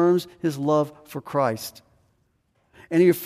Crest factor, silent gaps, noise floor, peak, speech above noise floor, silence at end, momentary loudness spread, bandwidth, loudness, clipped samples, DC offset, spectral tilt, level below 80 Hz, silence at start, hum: 16 dB; none; -68 dBFS; -8 dBFS; 46 dB; 0 s; 14 LU; 15.5 kHz; -24 LUFS; under 0.1%; under 0.1%; -6.5 dB/octave; -68 dBFS; 0 s; none